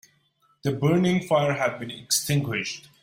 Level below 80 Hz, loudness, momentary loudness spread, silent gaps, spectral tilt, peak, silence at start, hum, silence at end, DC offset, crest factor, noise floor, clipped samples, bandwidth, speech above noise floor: -62 dBFS; -24 LUFS; 9 LU; none; -4.5 dB/octave; -8 dBFS; 0.65 s; none; 0.25 s; under 0.1%; 16 dB; -66 dBFS; under 0.1%; 16.5 kHz; 42 dB